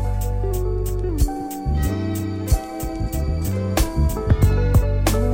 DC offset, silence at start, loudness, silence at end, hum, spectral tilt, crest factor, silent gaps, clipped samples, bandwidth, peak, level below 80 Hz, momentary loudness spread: under 0.1%; 0 s; -22 LUFS; 0 s; none; -6.5 dB/octave; 16 dB; none; under 0.1%; 17 kHz; -4 dBFS; -22 dBFS; 7 LU